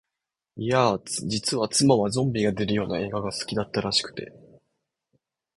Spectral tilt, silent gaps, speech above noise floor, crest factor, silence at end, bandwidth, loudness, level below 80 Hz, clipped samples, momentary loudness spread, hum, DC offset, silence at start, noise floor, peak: -4.5 dB/octave; none; 61 dB; 20 dB; 1.2 s; 12 kHz; -25 LUFS; -56 dBFS; under 0.1%; 9 LU; none; under 0.1%; 0.55 s; -86 dBFS; -6 dBFS